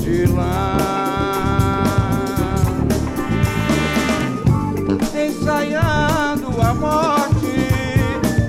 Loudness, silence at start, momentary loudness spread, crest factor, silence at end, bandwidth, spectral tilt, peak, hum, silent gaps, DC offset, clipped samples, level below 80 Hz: -18 LUFS; 0 s; 3 LU; 14 dB; 0 s; 16.5 kHz; -6 dB/octave; -4 dBFS; none; none; under 0.1%; under 0.1%; -30 dBFS